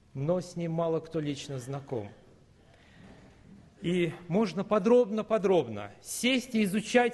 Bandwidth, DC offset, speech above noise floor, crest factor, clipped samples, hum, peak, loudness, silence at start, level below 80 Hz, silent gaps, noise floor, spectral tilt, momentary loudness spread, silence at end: 12.5 kHz; under 0.1%; 30 dB; 20 dB; under 0.1%; none; -10 dBFS; -29 LUFS; 0.15 s; -66 dBFS; none; -59 dBFS; -5.5 dB/octave; 13 LU; 0 s